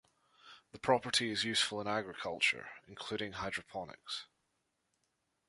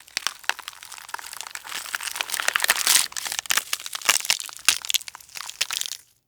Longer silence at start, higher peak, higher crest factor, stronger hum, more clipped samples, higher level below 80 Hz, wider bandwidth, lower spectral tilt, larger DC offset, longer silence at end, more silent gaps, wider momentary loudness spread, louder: first, 0.45 s vs 0.15 s; second, -14 dBFS vs 0 dBFS; about the same, 24 dB vs 26 dB; neither; neither; about the same, -70 dBFS vs -68 dBFS; second, 11.5 kHz vs over 20 kHz; first, -2.5 dB/octave vs 3 dB/octave; neither; first, 1.25 s vs 0.3 s; neither; second, 14 LU vs 17 LU; second, -35 LUFS vs -23 LUFS